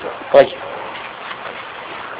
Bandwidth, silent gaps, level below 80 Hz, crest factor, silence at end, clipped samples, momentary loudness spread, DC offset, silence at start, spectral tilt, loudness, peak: 5.2 kHz; none; -58 dBFS; 20 dB; 0 s; under 0.1%; 16 LU; under 0.1%; 0 s; -7 dB/octave; -18 LUFS; 0 dBFS